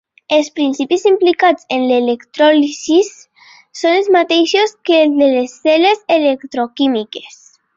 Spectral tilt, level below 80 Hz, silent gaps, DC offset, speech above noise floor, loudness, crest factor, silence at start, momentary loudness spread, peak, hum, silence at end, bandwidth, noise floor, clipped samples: -2.5 dB/octave; -64 dBFS; none; under 0.1%; 28 dB; -13 LUFS; 12 dB; 0.3 s; 8 LU; -2 dBFS; none; 0.5 s; 7.8 kHz; -41 dBFS; under 0.1%